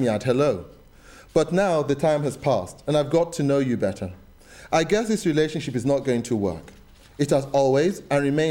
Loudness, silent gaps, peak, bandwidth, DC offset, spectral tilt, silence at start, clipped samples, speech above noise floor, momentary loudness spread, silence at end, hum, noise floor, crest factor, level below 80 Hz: -23 LUFS; none; -8 dBFS; 16.5 kHz; under 0.1%; -6 dB/octave; 0 s; under 0.1%; 26 dB; 6 LU; 0 s; none; -48 dBFS; 16 dB; -50 dBFS